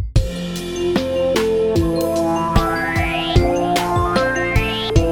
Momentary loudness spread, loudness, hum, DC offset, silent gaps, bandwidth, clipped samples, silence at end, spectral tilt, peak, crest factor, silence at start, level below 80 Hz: 4 LU; -18 LUFS; none; under 0.1%; none; 19 kHz; under 0.1%; 0 s; -5.5 dB/octave; 0 dBFS; 18 dB; 0 s; -26 dBFS